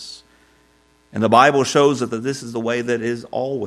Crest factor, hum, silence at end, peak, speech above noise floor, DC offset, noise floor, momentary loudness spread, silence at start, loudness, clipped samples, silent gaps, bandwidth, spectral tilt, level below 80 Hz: 20 dB; none; 0 s; 0 dBFS; 39 dB; under 0.1%; -57 dBFS; 12 LU; 0 s; -18 LUFS; under 0.1%; none; 13.5 kHz; -4.5 dB/octave; -62 dBFS